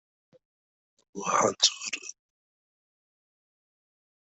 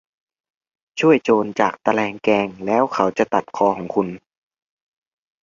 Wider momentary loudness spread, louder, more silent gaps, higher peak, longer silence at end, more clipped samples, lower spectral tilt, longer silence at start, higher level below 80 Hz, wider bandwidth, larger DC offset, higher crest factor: first, 20 LU vs 7 LU; second, -26 LUFS vs -19 LUFS; neither; second, -6 dBFS vs -2 dBFS; first, 2.3 s vs 1.25 s; neither; second, -1 dB/octave vs -6 dB/octave; first, 1.15 s vs 0.95 s; second, -78 dBFS vs -62 dBFS; first, 8.2 kHz vs 7.4 kHz; neither; first, 28 dB vs 20 dB